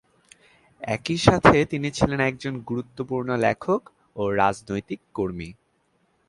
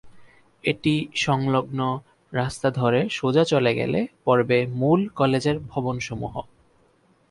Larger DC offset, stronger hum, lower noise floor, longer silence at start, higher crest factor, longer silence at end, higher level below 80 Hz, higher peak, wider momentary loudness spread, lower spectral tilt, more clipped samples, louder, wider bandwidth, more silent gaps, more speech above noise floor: neither; neither; first, -67 dBFS vs -61 dBFS; first, 0.8 s vs 0.05 s; first, 24 dB vs 18 dB; second, 0.75 s vs 0.9 s; first, -46 dBFS vs -54 dBFS; first, 0 dBFS vs -6 dBFS; first, 15 LU vs 9 LU; about the same, -6 dB/octave vs -6 dB/octave; neither; about the same, -23 LUFS vs -23 LUFS; about the same, 11.5 kHz vs 11.5 kHz; neither; first, 44 dB vs 39 dB